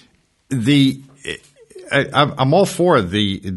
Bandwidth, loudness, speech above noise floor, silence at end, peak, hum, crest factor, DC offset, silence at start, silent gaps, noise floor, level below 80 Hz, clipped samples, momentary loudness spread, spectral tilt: 12 kHz; -16 LUFS; 40 dB; 0 s; 0 dBFS; none; 18 dB; under 0.1%; 0.5 s; none; -56 dBFS; -52 dBFS; under 0.1%; 15 LU; -5.5 dB/octave